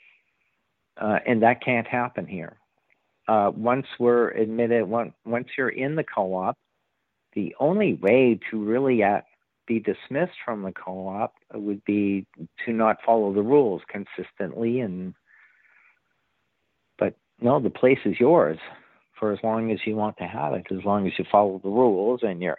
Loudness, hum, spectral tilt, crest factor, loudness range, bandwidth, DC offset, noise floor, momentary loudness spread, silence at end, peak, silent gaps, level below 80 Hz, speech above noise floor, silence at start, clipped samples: -24 LUFS; none; -10 dB/octave; 20 dB; 5 LU; 4.3 kHz; under 0.1%; -77 dBFS; 13 LU; 0.05 s; -4 dBFS; none; -70 dBFS; 54 dB; 0.95 s; under 0.1%